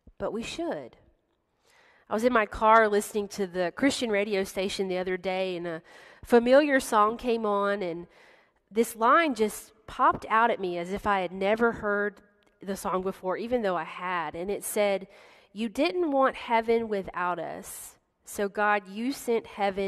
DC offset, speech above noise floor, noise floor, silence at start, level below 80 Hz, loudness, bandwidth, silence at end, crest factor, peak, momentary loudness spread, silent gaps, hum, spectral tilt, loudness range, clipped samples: under 0.1%; 46 dB; -73 dBFS; 0.2 s; -58 dBFS; -27 LUFS; 13.5 kHz; 0 s; 22 dB; -6 dBFS; 13 LU; none; none; -4.5 dB/octave; 4 LU; under 0.1%